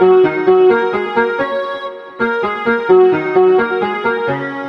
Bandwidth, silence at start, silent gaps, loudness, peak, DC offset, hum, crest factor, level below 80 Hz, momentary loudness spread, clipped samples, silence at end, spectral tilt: 5.4 kHz; 0 s; none; -14 LUFS; 0 dBFS; under 0.1%; none; 14 dB; -56 dBFS; 10 LU; under 0.1%; 0 s; -7.5 dB/octave